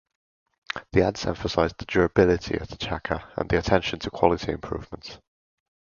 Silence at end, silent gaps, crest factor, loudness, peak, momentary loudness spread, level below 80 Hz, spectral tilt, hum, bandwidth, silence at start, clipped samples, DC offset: 0.8 s; none; 24 dB; -25 LUFS; -2 dBFS; 13 LU; -42 dBFS; -6 dB/octave; none; 7.2 kHz; 0.75 s; under 0.1%; under 0.1%